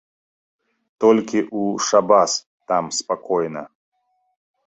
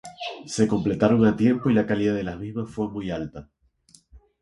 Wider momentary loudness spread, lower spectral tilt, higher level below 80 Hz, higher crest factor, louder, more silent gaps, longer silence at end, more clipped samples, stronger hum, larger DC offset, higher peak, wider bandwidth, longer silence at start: second, 9 LU vs 15 LU; second, -3.5 dB/octave vs -6.5 dB/octave; second, -66 dBFS vs -50 dBFS; about the same, 20 dB vs 20 dB; first, -19 LUFS vs -23 LUFS; first, 2.46-2.58 s vs none; first, 1 s vs 0.25 s; neither; neither; neither; about the same, -2 dBFS vs -4 dBFS; second, 8.2 kHz vs 11.5 kHz; first, 1 s vs 0.05 s